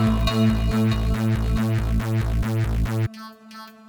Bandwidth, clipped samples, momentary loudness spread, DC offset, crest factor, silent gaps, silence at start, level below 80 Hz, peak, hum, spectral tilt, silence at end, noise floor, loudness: over 20 kHz; under 0.1%; 15 LU; under 0.1%; 14 dB; none; 0 s; -28 dBFS; -8 dBFS; none; -7 dB/octave; 0.2 s; -42 dBFS; -23 LUFS